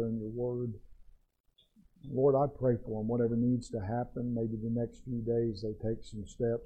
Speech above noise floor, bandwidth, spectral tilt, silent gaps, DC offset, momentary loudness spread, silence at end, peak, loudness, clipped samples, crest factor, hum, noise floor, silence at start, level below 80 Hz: 39 dB; 9 kHz; -9 dB/octave; 1.40-1.44 s; under 0.1%; 10 LU; 0 s; -18 dBFS; -33 LUFS; under 0.1%; 16 dB; none; -71 dBFS; 0 s; -54 dBFS